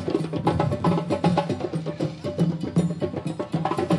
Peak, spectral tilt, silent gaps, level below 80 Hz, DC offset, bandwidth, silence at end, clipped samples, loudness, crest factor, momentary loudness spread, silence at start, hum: -6 dBFS; -7.5 dB/octave; none; -54 dBFS; under 0.1%; 11.5 kHz; 0 s; under 0.1%; -25 LUFS; 18 dB; 6 LU; 0 s; none